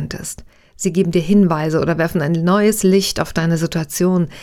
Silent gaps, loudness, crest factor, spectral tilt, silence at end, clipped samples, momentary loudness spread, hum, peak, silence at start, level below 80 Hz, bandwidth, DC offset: none; -16 LUFS; 16 dB; -5.5 dB/octave; 0 s; under 0.1%; 10 LU; none; 0 dBFS; 0 s; -42 dBFS; 17 kHz; under 0.1%